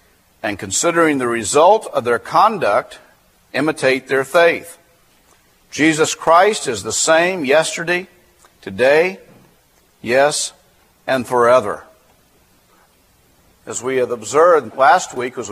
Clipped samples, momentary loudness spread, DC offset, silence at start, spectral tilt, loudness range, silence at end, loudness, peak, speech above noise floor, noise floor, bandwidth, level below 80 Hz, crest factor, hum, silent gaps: under 0.1%; 13 LU; under 0.1%; 0.45 s; -3 dB/octave; 4 LU; 0 s; -16 LUFS; 0 dBFS; 39 dB; -55 dBFS; 15.5 kHz; -58 dBFS; 18 dB; none; none